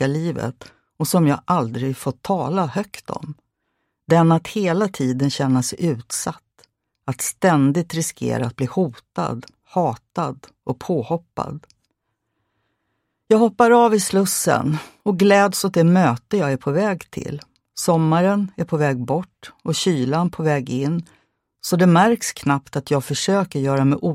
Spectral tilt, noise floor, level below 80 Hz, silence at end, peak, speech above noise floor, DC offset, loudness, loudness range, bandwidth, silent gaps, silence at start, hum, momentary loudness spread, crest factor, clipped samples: -5.5 dB/octave; -75 dBFS; -58 dBFS; 0 s; -2 dBFS; 55 dB; under 0.1%; -20 LUFS; 7 LU; 16 kHz; none; 0 s; none; 14 LU; 18 dB; under 0.1%